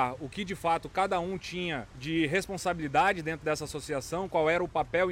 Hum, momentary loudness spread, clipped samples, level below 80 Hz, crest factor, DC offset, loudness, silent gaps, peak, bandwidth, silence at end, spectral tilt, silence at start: none; 8 LU; under 0.1%; -54 dBFS; 18 dB; under 0.1%; -30 LUFS; none; -12 dBFS; 16.5 kHz; 0 s; -4.5 dB/octave; 0 s